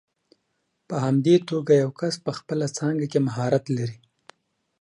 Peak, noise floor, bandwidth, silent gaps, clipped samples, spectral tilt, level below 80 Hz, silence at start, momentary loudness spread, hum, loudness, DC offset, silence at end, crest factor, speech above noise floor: -6 dBFS; -74 dBFS; 11 kHz; none; under 0.1%; -6.5 dB/octave; -68 dBFS; 0.9 s; 9 LU; none; -24 LUFS; under 0.1%; 0.85 s; 18 dB; 52 dB